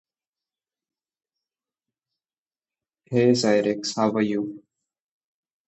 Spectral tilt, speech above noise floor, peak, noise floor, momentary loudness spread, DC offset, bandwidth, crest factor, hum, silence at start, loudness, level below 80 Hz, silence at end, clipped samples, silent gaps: -5.5 dB/octave; over 68 dB; -6 dBFS; under -90 dBFS; 9 LU; under 0.1%; 8.2 kHz; 22 dB; none; 3.1 s; -22 LUFS; -70 dBFS; 1.1 s; under 0.1%; none